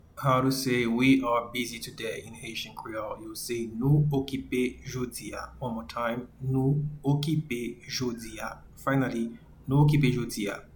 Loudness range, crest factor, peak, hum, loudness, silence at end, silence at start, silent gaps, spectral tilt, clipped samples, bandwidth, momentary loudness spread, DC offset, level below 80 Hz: 3 LU; 18 dB; -10 dBFS; none; -29 LUFS; 0.1 s; 0.15 s; none; -6 dB/octave; under 0.1%; 19 kHz; 14 LU; under 0.1%; -52 dBFS